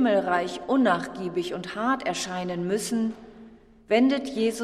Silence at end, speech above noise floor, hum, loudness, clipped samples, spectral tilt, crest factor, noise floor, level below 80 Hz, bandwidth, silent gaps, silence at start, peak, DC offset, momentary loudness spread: 0 s; 25 dB; none; -26 LUFS; under 0.1%; -4.5 dB/octave; 18 dB; -50 dBFS; -60 dBFS; 14 kHz; none; 0 s; -8 dBFS; under 0.1%; 8 LU